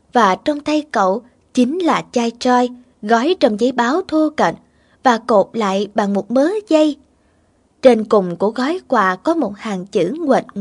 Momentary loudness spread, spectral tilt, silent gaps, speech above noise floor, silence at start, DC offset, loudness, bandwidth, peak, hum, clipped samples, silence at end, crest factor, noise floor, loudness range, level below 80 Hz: 6 LU; -5.5 dB/octave; none; 42 dB; 0.15 s; under 0.1%; -17 LUFS; 11 kHz; 0 dBFS; none; under 0.1%; 0 s; 16 dB; -57 dBFS; 1 LU; -60 dBFS